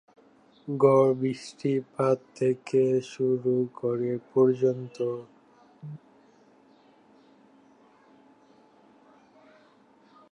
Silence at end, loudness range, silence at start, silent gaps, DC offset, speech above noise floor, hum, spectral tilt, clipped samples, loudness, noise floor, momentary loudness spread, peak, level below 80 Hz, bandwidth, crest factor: 4.35 s; 10 LU; 0.65 s; none; under 0.1%; 34 dB; none; -8 dB/octave; under 0.1%; -26 LUFS; -59 dBFS; 21 LU; -8 dBFS; -78 dBFS; 10 kHz; 20 dB